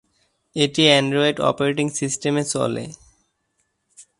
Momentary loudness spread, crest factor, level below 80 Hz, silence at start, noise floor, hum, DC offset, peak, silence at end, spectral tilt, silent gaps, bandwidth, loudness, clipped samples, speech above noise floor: 12 LU; 22 dB; -60 dBFS; 0.55 s; -71 dBFS; none; under 0.1%; 0 dBFS; 0.15 s; -4 dB/octave; none; 11.5 kHz; -19 LUFS; under 0.1%; 51 dB